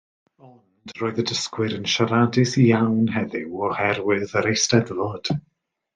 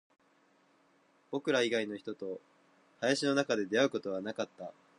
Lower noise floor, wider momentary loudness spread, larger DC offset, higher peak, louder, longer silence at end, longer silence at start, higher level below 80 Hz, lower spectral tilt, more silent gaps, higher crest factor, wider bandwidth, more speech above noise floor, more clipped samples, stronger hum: second, -51 dBFS vs -69 dBFS; about the same, 10 LU vs 12 LU; neither; first, -2 dBFS vs -14 dBFS; first, -22 LUFS vs -33 LUFS; first, 0.55 s vs 0.25 s; second, 0.45 s vs 1.3 s; first, -62 dBFS vs -84 dBFS; about the same, -5 dB/octave vs -4 dB/octave; neither; about the same, 20 dB vs 20 dB; second, 9.6 kHz vs 11.5 kHz; second, 30 dB vs 36 dB; neither; neither